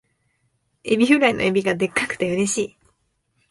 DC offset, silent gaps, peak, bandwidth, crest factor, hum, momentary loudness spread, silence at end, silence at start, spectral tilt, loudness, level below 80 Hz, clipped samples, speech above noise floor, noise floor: under 0.1%; none; -4 dBFS; 11.5 kHz; 20 dB; none; 9 LU; 0.85 s; 0.85 s; -4 dB/octave; -20 LUFS; -56 dBFS; under 0.1%; 49 dB; -69 dBFS